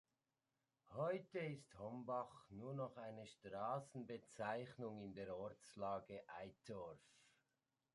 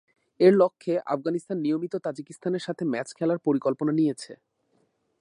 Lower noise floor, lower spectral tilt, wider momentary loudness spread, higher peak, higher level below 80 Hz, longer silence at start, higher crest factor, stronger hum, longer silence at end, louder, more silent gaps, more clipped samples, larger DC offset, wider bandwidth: first, under -90 dBFS vs -70 dBFS; about the same, -6.5 dB/octave vs -7 dB/octave; second, 9 LU vs 12 LU; second, -32 dBFS vs -6 dBFS; about the same, -82 dBFS vs -78 dBFS; first, 0.85 s vs 0.4 s; about the same, 20 dB vs 20 dB; neither; second, 0.65 s vs 0.85 s; second, -51 LUFS vs -26 LUFS; neither; neither; neither; about the same, 11.5 kHz vs 11 kHz